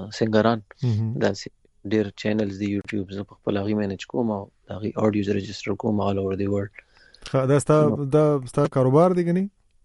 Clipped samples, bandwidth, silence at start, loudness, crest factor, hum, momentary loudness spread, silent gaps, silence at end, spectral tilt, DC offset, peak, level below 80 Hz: under 0.1%; 11.5 kHz; 0 s; -23 LUFS; 18 dB; none; 13 LU; none; 0.35 s; -7 dB/octave; under 0.1%; -4 dBFS; -56 dBFS